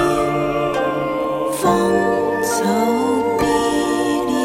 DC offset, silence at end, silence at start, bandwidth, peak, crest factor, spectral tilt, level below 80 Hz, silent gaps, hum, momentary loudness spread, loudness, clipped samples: under 0.1%; 0 s; 0 s; 16.5 kHz; -4 dBFS; 14 dB; -5 dB/octave; -44 dBFS; none; none; 4 LU; -18 LUFS; under 0.1%